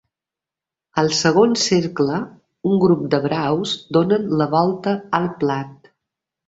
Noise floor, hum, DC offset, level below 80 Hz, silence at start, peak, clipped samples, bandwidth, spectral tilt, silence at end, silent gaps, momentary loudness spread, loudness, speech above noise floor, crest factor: -88 dBFS; none; under 0.1%; -58 dBFS; 0.95 s; -2 dBFS; under 0.1%; 8 kHz; -5 dB/octave; 0.75 s; none; 11 LU; -19 LUFS; 70 dB; 18 dB